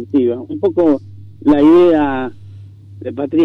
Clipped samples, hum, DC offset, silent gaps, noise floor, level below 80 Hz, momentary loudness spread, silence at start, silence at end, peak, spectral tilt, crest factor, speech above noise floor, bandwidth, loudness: under 0.1%; none; under 0.1%; none; -35 dBFS; -50 dBFS; 17 LU; 0 s; 0 s; -4 dBFS; -8.5 dB/octave; 10 dB; 23 dB; 5.2 kHz; -14 LUFS